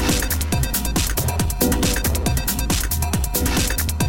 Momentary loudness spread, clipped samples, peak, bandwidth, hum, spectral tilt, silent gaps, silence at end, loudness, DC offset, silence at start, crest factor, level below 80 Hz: 2 LU; under 0.1%; -4 dBFS; 17 kHz; none; -4 dB/octave; none; 0 s; -20 LUFS; 1%; 0 s; 16 dB; -24 dBFS